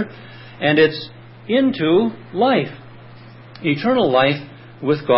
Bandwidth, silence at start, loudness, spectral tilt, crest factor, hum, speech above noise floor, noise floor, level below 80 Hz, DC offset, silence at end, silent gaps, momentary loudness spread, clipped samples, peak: 5.8 kHz; 0 s; -18 LUFS; -11 dB/octave; 16 dB; none; 23 dB; -40 dBFS; -60 dBFS; under 0.1%; 0 s; none; 23 LU; under 0.1%; -4 dBFS